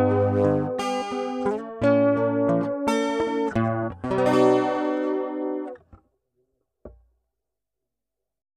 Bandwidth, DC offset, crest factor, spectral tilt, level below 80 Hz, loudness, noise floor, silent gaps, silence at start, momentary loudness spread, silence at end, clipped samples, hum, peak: 13 kHz; under 0.1%; 18 dB; -7 dB/octave; -56 dBFS; -23 LUFS; -86 dBFS; none; 0 s; 9 LU; 1.65 s; under 0.1%; none; -8 dBFS